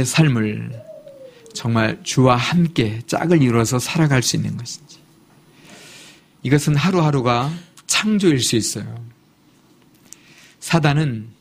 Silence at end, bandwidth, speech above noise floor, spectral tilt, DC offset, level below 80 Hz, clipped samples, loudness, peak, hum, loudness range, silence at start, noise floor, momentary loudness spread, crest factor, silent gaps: 0.1 s; 15.5 kHz; 36 dB; -5 dB/octave; under 0.1%; -50 dBFS; under 0.1%; -18 LUFS; 0 dBFS; none; 4 LU; 0 s; -54 dBFS; 18 LU; 20 dB; none